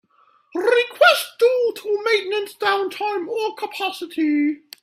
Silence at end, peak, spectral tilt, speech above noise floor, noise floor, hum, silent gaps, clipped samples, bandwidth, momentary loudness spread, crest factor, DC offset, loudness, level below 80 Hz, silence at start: 0.25 s; 0 dBFS; -1.5 dB/octave; 38 dB; -58 dBFS; none; none; under 0.1%; 16 kHz; 11 LU; 20 dB; under 0.1%; -20 LUFS; -74 dBFS; 0.55 s